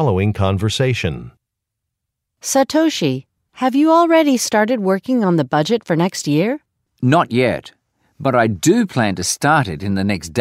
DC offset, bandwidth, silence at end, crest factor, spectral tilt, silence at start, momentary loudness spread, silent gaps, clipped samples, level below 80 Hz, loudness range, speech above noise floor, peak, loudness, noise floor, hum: under 0.1%; 16 kHz; 0 s; 16 dB; -5 dB/octave; 0 s; 8 LU; none; under 0.1%; -48 dBFS; 4 LU; 63 dB; -2 dBFS; -17 LUFS; -79 dBFS; none